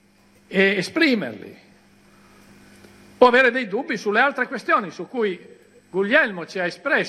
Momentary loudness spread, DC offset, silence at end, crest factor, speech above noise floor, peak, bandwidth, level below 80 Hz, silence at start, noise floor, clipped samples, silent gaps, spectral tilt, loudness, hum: 12 LU; under 0.1%; 0 s; 22 dB; 35 dB; 0 dBFS; 13 kHz; -68 dBFS; 0.5 s; -56 dBFS; under 0.1%; none; -5 dB/octave; -20 LUFS; none